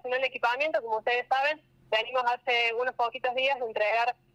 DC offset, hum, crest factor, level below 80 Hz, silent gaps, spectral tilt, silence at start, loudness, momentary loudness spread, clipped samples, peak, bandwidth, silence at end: under 0.1%; none; 16 dB; -74 dBFS; none; -2 dB/octave; 0.05 s; -28 LUFS; 4 LU; under 0.1%; -14 dBFS; 13 kHz; 0.2 s